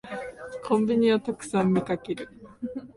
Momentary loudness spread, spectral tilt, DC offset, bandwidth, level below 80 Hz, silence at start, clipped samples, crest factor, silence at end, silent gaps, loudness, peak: 16 LU; -6.5 dB/octave; under 0.1%; 11.5 kHz; -60 dBFS; 0.05 s; under 0.1%; 16 dB; 0.05 s; none; -26 LUFS; -10 dBFS